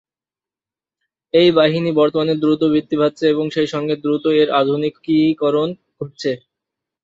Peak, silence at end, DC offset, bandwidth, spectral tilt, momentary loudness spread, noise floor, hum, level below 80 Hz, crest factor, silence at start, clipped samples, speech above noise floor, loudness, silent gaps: -2 dBFS; 0.65 s; under 0.1%; 7.6 kHz; -7 dB/octave; 10 LU; under -90 dBFS; none; -60 dBFS; 16 dB; 1.35 s; under 0.1%; over 74 dB; -17 LUFS; none